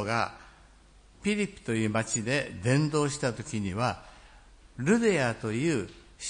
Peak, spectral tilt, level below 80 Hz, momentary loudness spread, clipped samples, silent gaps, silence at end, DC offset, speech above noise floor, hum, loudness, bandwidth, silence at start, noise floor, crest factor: -12 dBFS; -5 dB/octave; -56 dBFS; 9 LU; under 0.1%; none; 0 s; under 0.1%; 28 dB; none; -29 LUFS; 10.5 kHz; 0 s; -56 dBFS; 18 dB